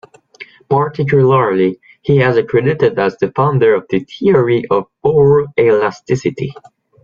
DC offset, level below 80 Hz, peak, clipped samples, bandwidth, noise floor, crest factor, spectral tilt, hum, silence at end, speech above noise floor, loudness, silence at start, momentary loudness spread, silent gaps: under 0.1%; -50 dBFS; -2 dBFS; under 0.1%; 7.2 kHz; -38 dBFS; 12 dB; -8 dB/octave; none; 0.5 s; 26 dB; -14 LUFS; 0.4 s; 7 LU; none